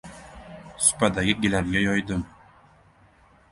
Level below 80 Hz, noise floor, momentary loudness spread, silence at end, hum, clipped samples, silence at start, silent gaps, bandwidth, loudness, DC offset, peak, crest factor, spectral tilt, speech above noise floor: -46 dBFS; -56 dBFS; 23 LU; 1.25 s; none; under 0.1%; 0.05 s; none; 11.5 kHz; -23 LUFS; under 0.1%; -4 dBFS; 22 dB; -3.5 dB/octave; 33 dB